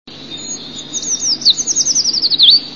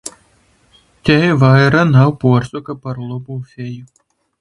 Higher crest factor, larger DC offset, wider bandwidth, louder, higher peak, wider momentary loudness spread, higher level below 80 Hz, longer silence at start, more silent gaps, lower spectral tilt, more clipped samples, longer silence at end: about the same, 16 dB vs 16 dB; first, 0.6% vs under 0.1%; about the same, 11 kHz vs 11.5 kHz; about the same, -11 LUFS vs -13 LUFS; about the same, 0 dBFS vs 0 dBFS; about the same, 18 LU vs 18 LU; second, -54 dBFS vs -44 dBFS; about the same, 0.05 s vs 0.05 s; neither; second, 1 dB/octave vs -7 dB/octave; neither; second, 0 s vs 0.55 s